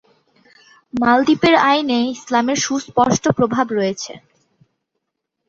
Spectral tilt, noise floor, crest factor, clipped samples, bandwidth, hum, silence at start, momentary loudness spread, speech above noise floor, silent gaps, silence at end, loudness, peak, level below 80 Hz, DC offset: -4 dB/octave; -77 dBFS; 18 dB; under 0.1%; 7.8 kHz; none; 0.95 s; 9 LU; 60 dB; none; 1.3 s; -16 LUFS; -2 dBFS; -54 dBFS; under 0.1%